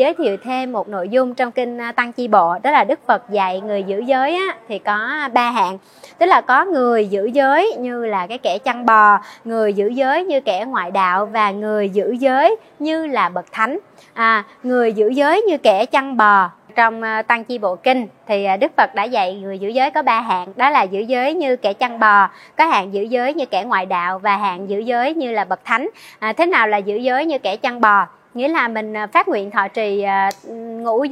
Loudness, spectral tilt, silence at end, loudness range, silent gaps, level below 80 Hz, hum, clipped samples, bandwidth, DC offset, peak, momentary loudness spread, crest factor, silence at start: -17 LUFS; -5 dB/octave; 0 s; 3 LU; none; -74 dBFS; none; under 0.1%; 13.5 kHz; under 0.1%; 0 dBFS; 8 LU; 16 dB; 0 s